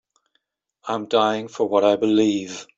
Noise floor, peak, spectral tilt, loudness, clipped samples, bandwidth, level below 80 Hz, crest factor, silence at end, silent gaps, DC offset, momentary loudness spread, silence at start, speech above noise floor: -72 dBFS; -4 dBFS; -5 dB/octave; -21 LUFS; under 0.1%; 7.8 kHz; -66 dBFS; 18 dB; 0.15 s; none; under 0.1%; 11 LU; 0.85 s; 52 dB